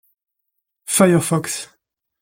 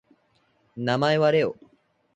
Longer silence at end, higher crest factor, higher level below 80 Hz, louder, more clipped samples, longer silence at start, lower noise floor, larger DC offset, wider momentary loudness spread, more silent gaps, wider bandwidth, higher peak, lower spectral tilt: about the same, 0.55 s vs 0.65 s; about the same, 18 dB vs 18 dB; first, -60 dBFS vs -68 dBFS; first, -17 LUFS vs -23 LUFS; neither; first, 0.9 s vs 0.75 s; first, -77 dBFS vs -66 dBFS; neither; about the same, 22 LU vs 23 LU; neither; first, 17 kHz vs 9 kHz; first, -2 dBFS vs -8 dBFS; second, -4.5 dB/octave vs -6.5 dB/octave